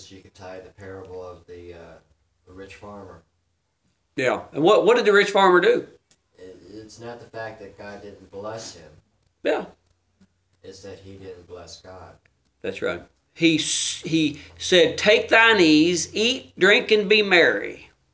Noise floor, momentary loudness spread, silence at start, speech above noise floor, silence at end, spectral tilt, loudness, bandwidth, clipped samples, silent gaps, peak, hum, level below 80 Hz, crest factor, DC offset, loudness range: -72 dBFS; 25 LU; 0.1 s; 50 dB; 0.4 s; -3.5 dB/octave; -19 LUFS; 8 kHz; under 0.1%; none; -2 dBFS; none; -58 dBFS; 22 dB; under 0.1%; 21 LU